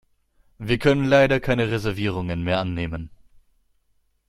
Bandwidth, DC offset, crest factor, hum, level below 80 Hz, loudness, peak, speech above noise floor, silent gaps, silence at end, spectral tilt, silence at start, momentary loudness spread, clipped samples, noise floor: 14.5 kHz; under 0.1%; 20 dB; none; -44 dBFS; -22 LUFS; -4 dBFS; 45 dB; none; 1.2 s; -6.5 dB/octave; 0.6 s; 15 LU; under 0.1%; -66 dBFS